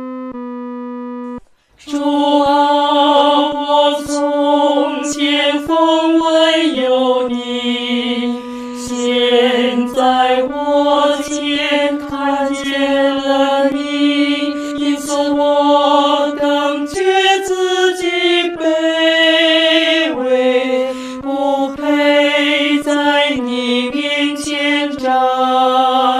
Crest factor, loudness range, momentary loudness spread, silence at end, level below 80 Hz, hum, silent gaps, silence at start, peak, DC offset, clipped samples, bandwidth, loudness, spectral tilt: 14 dB; 3 LU; 8 LU; 0 s; -52 dBFS; none; none; 0 s; 0 dBFS; under 0.1%; under 0.1%; 14 kHz; -14 LUFS; -2.5 dB/octave